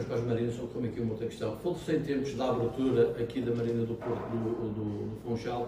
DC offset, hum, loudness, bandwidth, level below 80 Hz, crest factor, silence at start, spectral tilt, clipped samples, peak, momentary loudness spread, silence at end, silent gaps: under 0.1%; none; -32 LUFS; 15.5 kHz; -56 dBFS; 16 dB; 0 s; -7.5 dB/octave; under 0.1%; -14 dBFS; 7 LU; 0 s; none